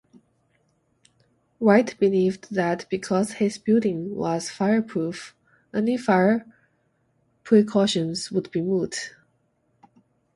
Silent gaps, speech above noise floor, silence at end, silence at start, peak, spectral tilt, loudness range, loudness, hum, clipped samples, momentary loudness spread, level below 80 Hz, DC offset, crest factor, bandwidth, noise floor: none; 46 dB; 1.25 s; 1.6 s; -4 dBFS; -5.5 dB/octave; 2 LU; -23 LUFS; none; under 0.1%; 10 LU; -66 dBFS; under 0.1%; 20 dB; 11.5 kHz; -68 dBFS